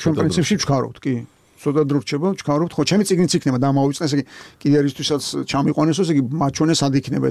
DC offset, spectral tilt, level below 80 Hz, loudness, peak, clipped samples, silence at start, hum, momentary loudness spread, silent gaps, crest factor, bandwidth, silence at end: under 0.1%; -5.5 dB/octave; -50 dBFS; -19 LUFS; -6 dBFS; under 0.1%; 0 s; none; 7 LU; none; 12 dB; 13.5 kHz; 0 s